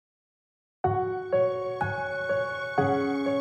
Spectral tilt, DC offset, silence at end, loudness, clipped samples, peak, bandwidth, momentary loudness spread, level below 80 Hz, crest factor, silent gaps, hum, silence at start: -7.5 dB/octave; under 0.1%; 0 s; -28 LUFS; under 0.1%; -12 dBFS; 8.2 kHz; 4 LU; -60 dBFS; 16 dB; none; none; 0.85 s